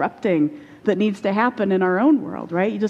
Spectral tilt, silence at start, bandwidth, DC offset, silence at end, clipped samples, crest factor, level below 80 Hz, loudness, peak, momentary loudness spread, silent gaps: -8 dB/octave; 0 s; 8.8 kHz; under 0.1%; 0 s; under 0.1%; 16 dB; -64 dBFS; -20 LUFS; -4 dBFS; 7 LU; none